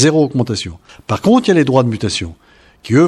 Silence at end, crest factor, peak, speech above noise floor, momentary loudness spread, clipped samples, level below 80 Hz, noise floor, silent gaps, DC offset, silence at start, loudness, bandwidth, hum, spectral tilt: 0 s; 14 dB; 0 dBFS; 25 dB; 15 LU; under 0.1%; -44 dBFS; -39 dBFS; none; under 0.1%; 0 s; -15 LUFS; 12 kHz; none; -5.5 dB/octave